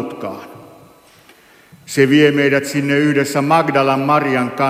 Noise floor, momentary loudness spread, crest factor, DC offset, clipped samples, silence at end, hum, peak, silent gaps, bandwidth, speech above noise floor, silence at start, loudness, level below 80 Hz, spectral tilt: -47 dBFS; 15 LU; 16 dB; under 0.1%; under 0.1%; 0 s; none; 0 dBFS; none; 15.5 kHz; 33 dB; 0 s; -14 LUFS; -62 dBFS; -5.5 dB/octave